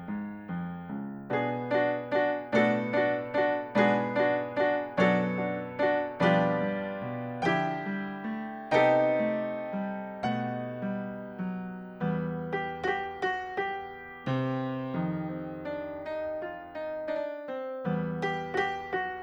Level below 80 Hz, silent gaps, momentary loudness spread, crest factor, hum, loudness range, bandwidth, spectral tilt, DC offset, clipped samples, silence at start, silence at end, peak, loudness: -66 dBFS; none; 12 LU; 20 dB; none; 7 LU; 20 kHz; -7.5 dB/octave; under 0.1%; under 0.1%; 0 s; 0 s; -10 dBFS; -30 LUFS